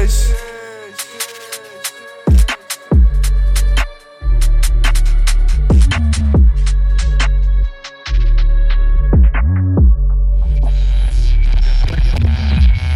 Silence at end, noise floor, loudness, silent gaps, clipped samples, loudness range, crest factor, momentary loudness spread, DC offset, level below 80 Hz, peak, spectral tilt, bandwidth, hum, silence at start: 0 s; -31 dBFS; -15 LUFS; none; under 0.1%; 2 LU; 10 dB; 12 LU; under 0.1%; -12 dBFS; 0 dBFS; -5.5 dB/octave; 14 kHz; none; 0 s